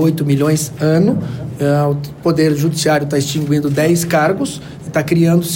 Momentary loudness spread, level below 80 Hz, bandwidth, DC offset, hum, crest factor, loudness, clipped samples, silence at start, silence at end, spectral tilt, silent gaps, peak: 7 LU; -46 dBFS; 16.5 kHz; under 0.1%; none; 12 dB; -15 LUFS; under 0.1%; 0 s; 0 s; -6 dB/octave; none; -4 dBFS